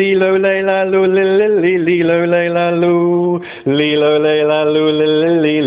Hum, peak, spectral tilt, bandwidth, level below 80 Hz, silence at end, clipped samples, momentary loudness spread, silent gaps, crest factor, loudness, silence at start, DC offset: none; -2 dBFS; -10 dB/octave; 4 kHz; -56 dBFS; 0 s; under 0.1%; 2 LU; none; 12 dB; -13 LUFS; 0 s; under 0.1%